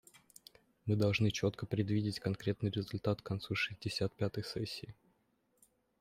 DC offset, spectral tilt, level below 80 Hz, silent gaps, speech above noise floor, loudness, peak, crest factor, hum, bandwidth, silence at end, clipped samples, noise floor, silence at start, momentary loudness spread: under 0.1%; -6 dB/octave; -66 dBFS; none; 41 dB; -37 LUFS; -20 dBFS; 18 dB; none; 15 kHz; 1.05 s; under 0.1%; -77 dBFS; 0.85 s; 13 LU